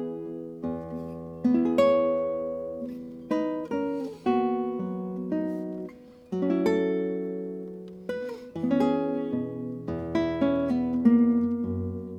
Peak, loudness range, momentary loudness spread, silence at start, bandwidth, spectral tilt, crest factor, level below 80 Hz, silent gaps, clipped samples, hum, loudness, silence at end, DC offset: -10 dBFS; 4 LU; 15 LU; 0 s; 8 kHz; -8.5 dB/octave; 18 dB; -58 dBFS; none; under 0.1%; none; -28 LUFS; 0 s; under 0.1%